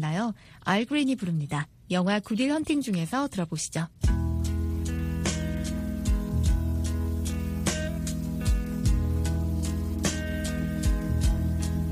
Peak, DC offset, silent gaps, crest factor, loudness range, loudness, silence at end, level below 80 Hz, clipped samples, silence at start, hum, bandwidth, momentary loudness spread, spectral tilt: -8 dBFS; under 0.1%; none; 18 dB; 2 LU; -28 LUFS; 0 s; -32 dBFS; under 0.1%; 0 s; none; 15.5 kHz; 4 LU; -5.5 dB/octave